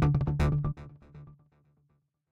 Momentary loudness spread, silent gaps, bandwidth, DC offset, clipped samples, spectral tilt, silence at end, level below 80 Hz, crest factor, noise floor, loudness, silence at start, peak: 24 LU; none; 7.4 kHz; under 0.1%; under 0.1%; -8.5 dB/octave; 1 s; -40 dBFS; 16 dB; -73 dBFS; -29 LUFS; 0 s; -14 dBFS